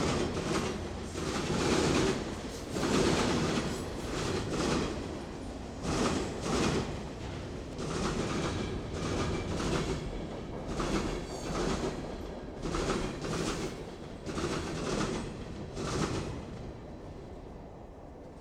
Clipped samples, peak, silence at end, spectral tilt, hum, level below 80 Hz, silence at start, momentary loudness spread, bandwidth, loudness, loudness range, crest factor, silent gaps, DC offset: under 0.1%; -16 dBFS; 0 s; -5 dB/octave; none; -44 dBFS; 0 s; 13 LU; 15.5 kHz; -34 LUFS; 5 LU; 18 dB; none; under 0.1%